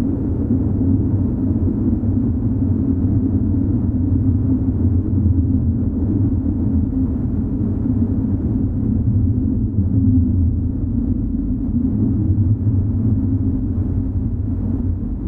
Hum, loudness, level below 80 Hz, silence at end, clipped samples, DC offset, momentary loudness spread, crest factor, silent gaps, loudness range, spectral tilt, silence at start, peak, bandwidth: none; -19 LUFS; -26 dBFS; 0 s; under 0.1%; under 0.1%; 4 LU; 12 dB; none; 1 LU; -14 dB/octave; 0 s; -4 dBFS; 1.8 kHz